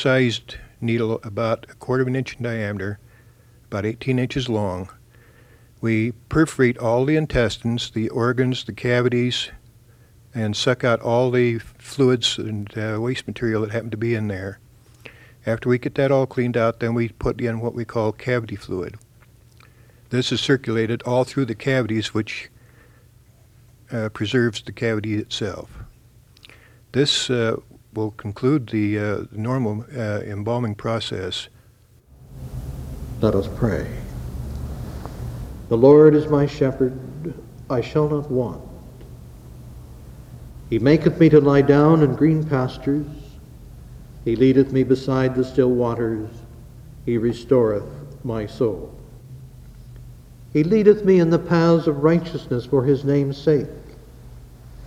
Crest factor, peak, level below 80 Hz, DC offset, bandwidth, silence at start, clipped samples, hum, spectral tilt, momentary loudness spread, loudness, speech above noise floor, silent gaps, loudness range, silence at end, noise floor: 20 dB; -2 dBFS; -42 dBFS; under 0.1%; 15.5 kHz; 0 s; under 0.1%; none; -6.5 dB/octave; 18 LU; -21 LUFS; 33 dB; none; 9 LU; 0 s; -53 dBFS